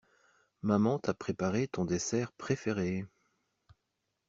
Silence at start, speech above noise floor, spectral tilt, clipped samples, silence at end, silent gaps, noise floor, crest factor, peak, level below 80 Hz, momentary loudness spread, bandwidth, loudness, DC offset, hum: 0.65 s; 51 dB; -6 dB/octave; under 0.1%; 1.2 s; none; -83 dBFS; 22 dB; -14 dBFS; -68 dBFS; 8 LU; 8 kHz; -33 LUFS; under 0.1%; none